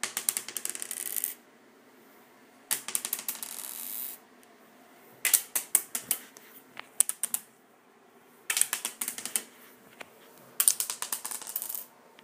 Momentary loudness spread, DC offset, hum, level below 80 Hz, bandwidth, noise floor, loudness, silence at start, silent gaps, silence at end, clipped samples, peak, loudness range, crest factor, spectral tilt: 23 LU; under 0.1%; none; -84 dBFS; 16 kHz; -60 dBFS; -30 LUFS; 0.05 s; none; 0.15 s; under 0.1%; 0 dBFS; 6 LU; 34 dB; 2 dB/octave